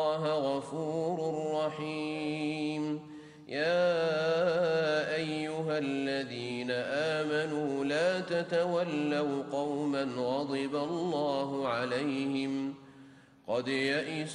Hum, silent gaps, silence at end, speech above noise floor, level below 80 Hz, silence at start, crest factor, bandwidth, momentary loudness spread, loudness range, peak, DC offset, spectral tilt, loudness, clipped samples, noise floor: none; none; 0 s; 24 dB; -74 dBFS; 0 s; 14 dB; 11 kHz; 7 LU; 3 LU; -18 dBFS; under 0.1%; -5.5 dB/octave; -32 LUFS; under 0.1%; -56 dBFS